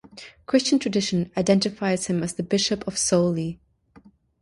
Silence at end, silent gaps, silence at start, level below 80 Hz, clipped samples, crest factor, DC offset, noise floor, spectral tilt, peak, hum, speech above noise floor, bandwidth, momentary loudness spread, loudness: 0.85 s; none; 0.15 s; -56 dBFS; under 0.1%; 18 dB; under 0.1%; -54 dBFS; -4.5 dB/octave; -6 dBFS; none; 31 dB; 11.5 kHz; 10 LU; -23 LUFS